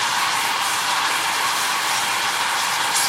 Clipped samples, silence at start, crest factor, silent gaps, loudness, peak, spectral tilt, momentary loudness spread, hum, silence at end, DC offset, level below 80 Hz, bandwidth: under 0.1%; 0 s; 14 dB; none; -19 LUFS; -6 dBFS; 1 dB/octave; 1 LU; none; 0 s; under 0.1%; -66 dBFS; 16.5 kHz